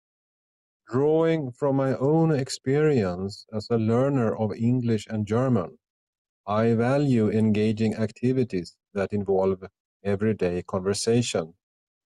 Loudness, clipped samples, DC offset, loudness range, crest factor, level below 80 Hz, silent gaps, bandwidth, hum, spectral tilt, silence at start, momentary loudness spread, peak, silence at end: -25 LUFS; under 0.1%; under 0.1%; 3 LU; 14 dB; -62 dBFS; 5.90-6.44 s, 9.80-10.00 s; 12 kHz; none; -7 dB/octave; 0.9 s; 9 LU; -10 dBFS; 0.55 s